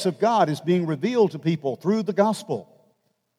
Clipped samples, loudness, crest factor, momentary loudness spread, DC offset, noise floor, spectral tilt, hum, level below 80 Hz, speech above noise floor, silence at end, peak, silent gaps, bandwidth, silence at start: under 0.1%; -23 LUFS; 18 dB; 7 LU; under 0.1%; -69 dBFS; -6.5 dB/octave; none; -80 dBFS; 47 dB; 0.75 s; -6 dBFS; none; 14.5 kHz; 0 s